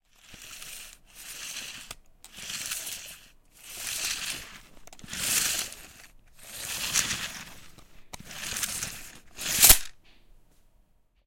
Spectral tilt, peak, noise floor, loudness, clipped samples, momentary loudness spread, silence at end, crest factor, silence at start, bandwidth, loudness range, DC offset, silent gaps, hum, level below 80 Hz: 0.5 dB/octave; 0 dBFS; -64 dBFS; -26 LUFS; under 0.1%; 24 LU; 1.3 s; 32 dB; 0.3 s; 17 kHz; 13 LU; under 0.1%; none; none; -46 dBFS